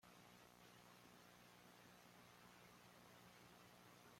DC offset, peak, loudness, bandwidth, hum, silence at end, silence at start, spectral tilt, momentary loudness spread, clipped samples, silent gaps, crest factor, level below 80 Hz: under 0.1%; -52 dBFS; -66 LUFS; 16.5 kHz; 60 Hz at -75 dBFS; 0 s; 0 s; -3.5 dB/octave; 1 LU; under 0.1%; none; 14 dB; -88 dBFS